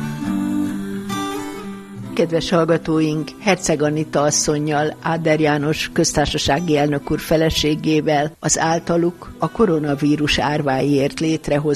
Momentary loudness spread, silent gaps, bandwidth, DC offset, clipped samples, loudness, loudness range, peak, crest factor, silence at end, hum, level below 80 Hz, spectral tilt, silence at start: 8 LU; none; 14 kHz; under 0.1%; under 0.1%; -19 LUFS; 2 LU; -2 dBFS; 16 dB; 0 s; none; -40 dBFS; -4.5 dB/octave; 0 s